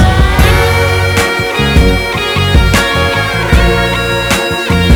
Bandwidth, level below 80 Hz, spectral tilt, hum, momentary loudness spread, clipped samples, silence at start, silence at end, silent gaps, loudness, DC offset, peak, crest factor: over 20 kHz; -16 dBFS; -5 dB/octave; none; 3 LU; 0.3%; 0 s; 0 s; none; -10 LUFS; under 0.1%; 0 dBFS; 10 dB